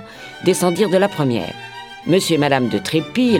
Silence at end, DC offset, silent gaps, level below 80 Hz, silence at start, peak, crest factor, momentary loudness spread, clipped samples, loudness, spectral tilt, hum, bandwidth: 0 s; 0.1%; none; -58 dBFS; 0 s; -2 dBFS; 16 dB; 14 LU; under 0.1%; -17 LUFS; -5 dB/octave; none; 18 kHz